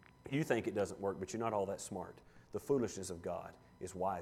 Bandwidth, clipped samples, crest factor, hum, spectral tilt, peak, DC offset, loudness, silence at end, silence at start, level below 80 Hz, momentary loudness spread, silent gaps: 16 kHz; under 0.1%; 18 dB; none; -5.5 dB/octave; -22 dBFS; under 0.1%; -40 LUFS; 0 s; 0.25 s; -68 dBFS; 12 LU; none